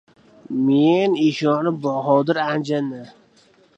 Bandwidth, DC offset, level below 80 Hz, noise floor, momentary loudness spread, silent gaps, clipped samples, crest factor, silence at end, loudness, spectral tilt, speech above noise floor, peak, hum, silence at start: 8 kHz; under 0.1%; -70 dBFS; -55 dBFS; 10 LU; none; under 0.1%; 16 dB; 0.7 s; -19 LUFS; -7 dB/octave; 36 dB; -4 dBFS; none; 0.5 s